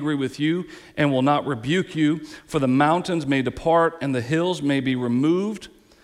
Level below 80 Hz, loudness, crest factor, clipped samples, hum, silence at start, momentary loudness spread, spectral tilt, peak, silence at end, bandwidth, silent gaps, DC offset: -54 dBFS; -22 LUFS; 16 dB; under 0.1%; none; 0 s; 8 LU; -6.5 dB/octave; -6 dBFS; 0.35 s; 12.5 kHz; none; under 0.1%